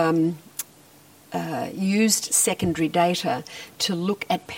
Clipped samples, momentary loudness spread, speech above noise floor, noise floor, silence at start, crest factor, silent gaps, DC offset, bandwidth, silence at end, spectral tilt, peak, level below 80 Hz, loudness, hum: under 0.1%; 14 LU; 28 dB; -52 dBFS; 0 s; 18 dB; none; under 0.1%; 16.5 kHz; 0 s; -3.5 dB/octave; -6 dBFS; -60 dBFS; -23 LUFS; none